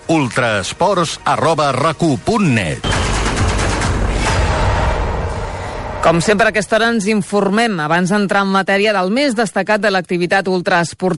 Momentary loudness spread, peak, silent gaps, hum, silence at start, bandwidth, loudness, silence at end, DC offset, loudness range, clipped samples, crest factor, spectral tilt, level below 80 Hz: 4 LU; -4 dBFS; none; none; 0 s; 11.5 kHz; -15 LUFS; 0 s; under 0.1%; 3 LU; under 0.1%; 12 dB; -5 dB/octave; -26 dBFS